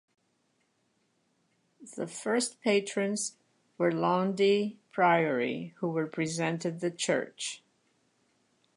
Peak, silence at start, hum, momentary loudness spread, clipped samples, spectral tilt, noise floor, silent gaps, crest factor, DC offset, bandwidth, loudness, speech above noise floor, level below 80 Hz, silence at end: -12 dBFS; 1.8 s; none; 11 LU; under 0.1%; -4.5 dB/octave; -74 dBFS; none; 20 dB; under 0.1%; 11.5 kHz; -30 LUFS; 45 dB; -82 dBFS; 1.2 s